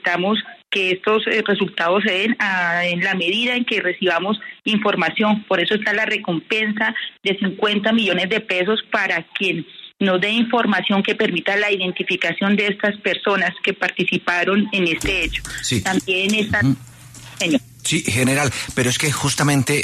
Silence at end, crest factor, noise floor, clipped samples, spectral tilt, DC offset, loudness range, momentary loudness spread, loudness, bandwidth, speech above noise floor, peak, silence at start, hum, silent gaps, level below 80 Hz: 0 s; 14 dB; -40 dBFS; under 0.1%; -4 dB/octave; under 0.1%; 1 LU; 4 LU; -19 LUFS; 13.5 kHz; 20 dB; -4 dBFS; 0.05 s; none; none; -46 dBFS